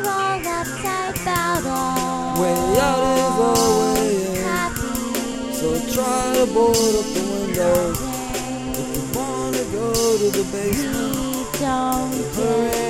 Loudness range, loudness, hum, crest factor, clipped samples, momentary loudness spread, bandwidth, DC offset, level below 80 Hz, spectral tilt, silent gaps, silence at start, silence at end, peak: 3 LU; -20 LUFS; none; 16 dB; under 0.1%; 8 LU; 17 kHz; 0.1%; -40 dBFS; -4 dB/octave; none; 0 s; 0 s; -4 dBFS